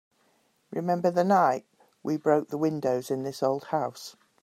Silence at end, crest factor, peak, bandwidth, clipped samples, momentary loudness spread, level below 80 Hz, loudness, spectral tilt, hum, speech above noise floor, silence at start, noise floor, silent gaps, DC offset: 0.3 s; 18 dB; -10 dBFS; 16 kHz; under 0.1%; 14 LU; -76 dBFS; -27 LUFS; -6.5 dB/octave; none; 42 dB; 0.7 s; -68 dBFS; none; under 0.1%